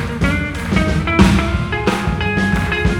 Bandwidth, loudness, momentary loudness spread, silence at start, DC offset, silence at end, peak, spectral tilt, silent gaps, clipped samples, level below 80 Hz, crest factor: 16 kHz; -16 LUFS; 6 LU; 0 s; under 0.1%; 0 s; 0 dBFS; -6 dB/octave; none; under 0.1%; -24 dBFS; 16 dB